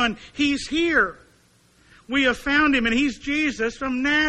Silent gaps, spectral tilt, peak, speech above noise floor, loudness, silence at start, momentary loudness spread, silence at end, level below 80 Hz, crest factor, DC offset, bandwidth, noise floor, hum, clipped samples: none; -3.5 dB/octave; -6 dBFS; 36 dB; -21 LUFS; 0 s; 6 LU; 0 s; -46 dBFS; 16 dB; under 0.1%; 12 kHz; -58 dBFS; none; under 0.1%